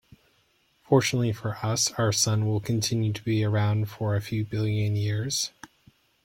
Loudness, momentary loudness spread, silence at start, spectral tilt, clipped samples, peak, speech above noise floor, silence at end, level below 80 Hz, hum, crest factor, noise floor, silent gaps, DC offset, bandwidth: -26 LUFS; 6 LU; 0.9 s; -4.5 dB/octave; under 0.1%; -8 dBFS; 41 dB; 0.6 s; -58 dBFS; none; 20 dB; -67 dBFS; none; under 0.1%; 16.5 kHz